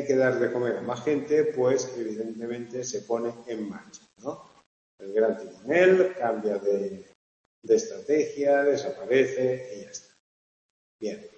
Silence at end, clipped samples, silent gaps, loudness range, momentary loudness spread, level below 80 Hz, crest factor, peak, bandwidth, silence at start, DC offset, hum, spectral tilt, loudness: 0.1 s; under 0.1%; 4.66-4.98 s, 7.15-7.62 s, 10.20-10.99 s; 7 LU; 16 LU; -74 dBFS; 18 dB; -8 dBFS; 8.4 kHz; 0 s; under 0.1%; none; -5 dB/octave; -26 LUFS